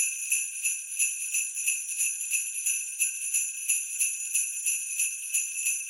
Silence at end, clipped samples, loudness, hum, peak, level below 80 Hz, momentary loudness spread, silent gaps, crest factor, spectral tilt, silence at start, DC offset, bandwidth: 0 s; under 0.1%; -27 LUFS; none; -10 dBFS; under -90 dBFS; 2 LU; none; 20 dB; 10.5 dB/octave; 0 s; under 0.1%; 17 kHz